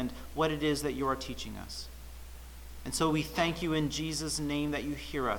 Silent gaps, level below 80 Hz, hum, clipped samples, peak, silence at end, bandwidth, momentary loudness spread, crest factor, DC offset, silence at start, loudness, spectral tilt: none; -48 dBFS; none; under 0.1%; -14 dBFS; 0 s; 19 kHz; 19 LU; 20 dB; under 0.1%; 0 s; -33 LUFS; -4.5 dB/octave